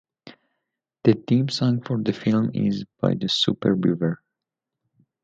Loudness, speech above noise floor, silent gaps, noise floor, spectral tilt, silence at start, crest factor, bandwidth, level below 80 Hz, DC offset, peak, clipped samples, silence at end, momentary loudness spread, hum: -23 LUFS; 64 dB; none; -85 dBFS; -6.5 dB/octave; 0.25 s; 22 dB; 9 kHz; -60 dBFS; under 0.1%; -2 dBFS; under 0.1%; 1.1 s; 5 LU; none